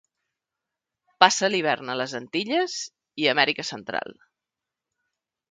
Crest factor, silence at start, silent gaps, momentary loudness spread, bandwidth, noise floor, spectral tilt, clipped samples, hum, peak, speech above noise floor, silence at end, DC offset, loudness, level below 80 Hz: 26 dB; 1.2 s; none; 13 LU; 9.6 kHz; -87 dBFS; -2.5 dB/octave; under 0.1%; none; 0 dBFS; 63 dB; 1.4 s; under 0.1%; -24 LUFS; -74 dBFS